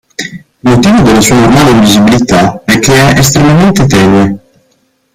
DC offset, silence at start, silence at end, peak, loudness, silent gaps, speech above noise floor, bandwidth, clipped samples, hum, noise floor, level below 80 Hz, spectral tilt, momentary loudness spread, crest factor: under 0.1%; 0.2 s; 0.75 s; 0 dBFS; -5 LUFS; none; 49 dB; 16.5 kHz; 0.4%; none; -53 dBFS; -28 dBFS; -5 dB/octave; 9 LU; 6 dB